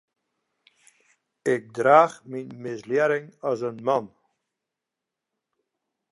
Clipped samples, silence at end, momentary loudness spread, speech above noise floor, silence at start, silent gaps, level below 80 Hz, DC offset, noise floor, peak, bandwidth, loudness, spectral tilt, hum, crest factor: under 0.1%; 2.05 s; 17 LU; 63 dB; 1.45 s; none; -78 dBFS; under 0.1%; -86 dBFS; -4 dBFS; 11.5 kHz; -23 LUFS; -6 dB/octave; none; 24 dB